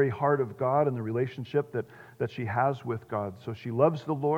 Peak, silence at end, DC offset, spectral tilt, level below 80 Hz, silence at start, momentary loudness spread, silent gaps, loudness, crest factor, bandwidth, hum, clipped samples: -8 dBFS; 0 s; under 0.1%; -9 dB/octave; -72 dBFS; 0 s; 10 LU; none; -29 LUFS; 20 dB; 15.5 kHz; none; under 0.1%